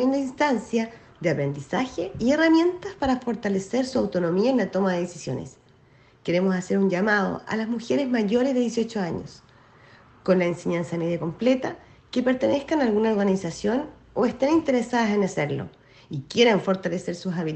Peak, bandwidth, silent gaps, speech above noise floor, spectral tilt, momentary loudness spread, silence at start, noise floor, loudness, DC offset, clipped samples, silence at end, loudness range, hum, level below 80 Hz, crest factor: -6 dBFS; 8.8 kHz; none; 32 dB; -6 dB/octave; 10 LU; 0 s; -56 dBFS; -24 LUFS; under 0.1%; under 0.1%; 0 s; 3 LU; none; -56 dBFS; 18 dB